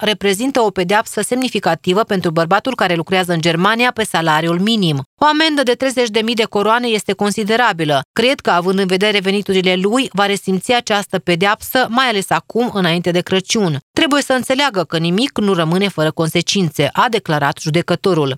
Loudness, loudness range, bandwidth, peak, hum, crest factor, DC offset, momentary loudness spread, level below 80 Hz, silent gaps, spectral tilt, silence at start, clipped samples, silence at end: -15 LUFS; 1 LU; 16 kHz; 0 dBFS; none; 16 dB; under 0.1%; 3 LU; -54 dBFS; 5.06-5.17 s, 8.05-8.14 s, 13.82-13.94 s; -4.5 dB/octave; 0 s; under 0.1%; 0 s